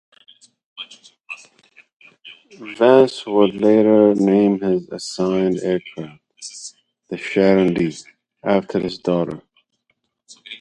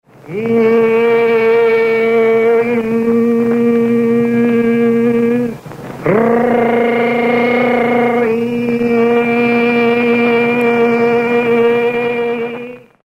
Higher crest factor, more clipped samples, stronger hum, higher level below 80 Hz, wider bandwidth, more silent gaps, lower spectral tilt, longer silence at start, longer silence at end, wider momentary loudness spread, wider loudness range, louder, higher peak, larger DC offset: first, 20 dB vs 12 dB; neither; neither; second, -58 dBFS vs -52 dBFS; first, 11 kHz vs 7.8 kHz; first, 1.93-2.00 s vs none; about the same, -6.5 dB/octave vs -7 dB/octave; first, 0.8 s vs 0.25 s; second, 0.05 s vs 0.25 s; first, 22 LU vs 6 LU; first, 5 LU vs 1 LU; second, -17 LUFS vs -12 LUFS; about the same, 0 dBFS vs -2 dBFS; neither